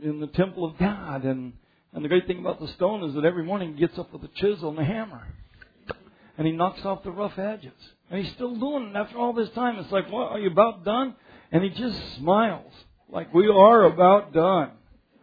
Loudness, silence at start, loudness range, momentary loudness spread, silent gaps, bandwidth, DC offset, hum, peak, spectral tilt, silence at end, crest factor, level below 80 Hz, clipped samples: -24 LUFS; 0 s; 11 LU; 18 LU; none; 5 kHz; under 0.1%; none; -2 dBFS; -9.5 dB/octave; 0.55 s; 22 dB; -54 dBFS; under 0.1%